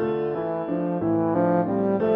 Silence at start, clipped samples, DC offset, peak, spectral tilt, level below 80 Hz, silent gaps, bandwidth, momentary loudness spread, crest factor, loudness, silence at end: 0 s; under 0.1%; under 0.1%; -8 dBFS; -11.5 dB/octave; -60 dBFS; none; 4.4 kHz; 5 LU; 14 dB; -24 LUFS; 0 s